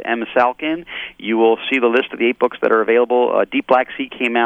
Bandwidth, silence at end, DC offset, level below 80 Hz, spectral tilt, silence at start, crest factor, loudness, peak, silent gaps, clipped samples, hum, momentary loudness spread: 4.9 kHz; 0 s; under 0.1%; -60 dBFS; -6 dB/octave; 0 s; 16 dB; -17 LUFS; -2 dBFS; none; under 0.1%; none; 9 LU